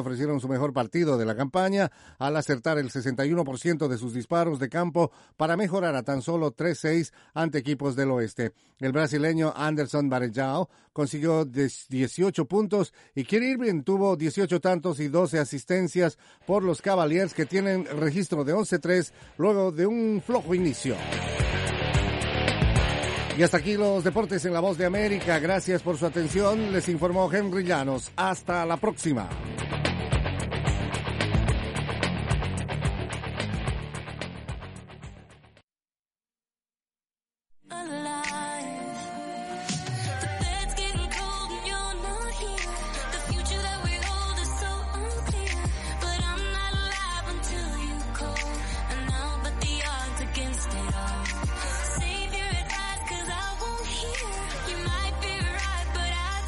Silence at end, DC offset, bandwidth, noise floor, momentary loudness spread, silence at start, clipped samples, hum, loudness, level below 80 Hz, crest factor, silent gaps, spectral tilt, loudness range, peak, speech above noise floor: 0 s; under 0.1%; 11.5 kHz; under -90 dBFS; 8 LU; 0 s; under 0.1%; none; -28 LUFS; -36 dBFS; 18 dB; 35.63-35.68 s, 35.99-36.03 s; -5 dB/octave; 7 LU; -8 dBFS; over 64 dB